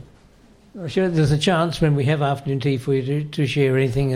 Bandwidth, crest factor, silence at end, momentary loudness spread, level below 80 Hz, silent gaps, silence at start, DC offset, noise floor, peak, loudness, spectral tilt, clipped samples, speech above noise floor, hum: 12 kHz; 14 dB; 0 s; 5 LU; -44 dBFS; none; 0.75 s; under 0.1%; -51 dBFS; -6 dBFS; -20 LUFS; -7 dB/octave; under 0.1%; 31 dB; none